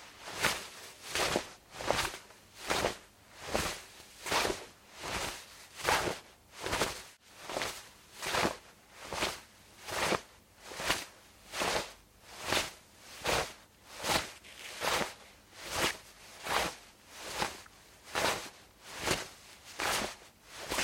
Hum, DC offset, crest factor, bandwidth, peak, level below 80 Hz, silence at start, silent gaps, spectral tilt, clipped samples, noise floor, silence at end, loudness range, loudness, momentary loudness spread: none; under 0.1%; 28 dB; 16.5 kHz; -10 dBFS; -58 dBFS; 0 s; none; -2 dB/octave; under 0.1%; -55 dBFS; 0 s; 2 LU; -35 LUFS; 19 LU